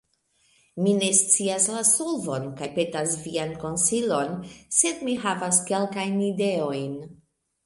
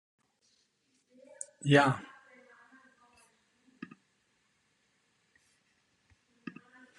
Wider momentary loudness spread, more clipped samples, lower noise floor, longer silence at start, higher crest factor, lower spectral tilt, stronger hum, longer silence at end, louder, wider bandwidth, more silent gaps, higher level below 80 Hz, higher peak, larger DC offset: second, 11 LU vs 27 LU; neither; second, -67 dBFS vs -75 dBFS; second, 0.75 s vs 1.65 s; second, 22 dB vs 28 dB; second, -3 dB/octave vs -5.5 dB/octave; neither; second, 0.5 s vs 4.95 s; first, -23 LUFS vs -28 LUFS; about the same, 12 kHz vs 11 kHz; neither; first, -64 dBFS vs -74 dBFS; first, -4 dBFS vs -10 dBFS; neither